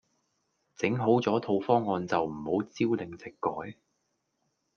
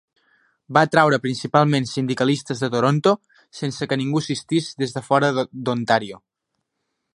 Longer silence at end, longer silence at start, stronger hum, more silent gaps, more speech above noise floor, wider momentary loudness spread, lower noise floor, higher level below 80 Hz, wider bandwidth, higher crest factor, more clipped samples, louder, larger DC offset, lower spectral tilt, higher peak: about the same, 1.05 s vs 0.95 s; about the same, 0.8 s vs 0.7 s; neither; neither; second, 50 dB vs 58 dB; about the same, 9 LU vs 9 LU; about the same, -78 dBFS vs -78 dBFS; second, -70 dBFS vs -64 dBFS; second, 7 kHz vs 11.5 kHz; about the same, 22 dB vs 20 dB; neither; second, -29 LUFS vs -21 LUFS; neither; first, -7 dB/octave vs -5.5 dB/octave; second, -10 dBFS vs 0 dBFS